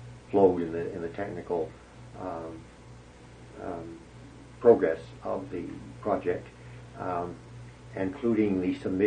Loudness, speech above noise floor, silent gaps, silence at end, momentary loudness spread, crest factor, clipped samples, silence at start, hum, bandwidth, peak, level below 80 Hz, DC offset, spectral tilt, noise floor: -29 LUFS; 21 dB; none; 0 s; 25 LU; 24 dB; under 0.1%; 0 s; 60 Hz at -50 dBFS; 9.8 kHz; -6 dBFS; -56 dBFS; under 0.1%; -8 dB/octave; -50 dBFS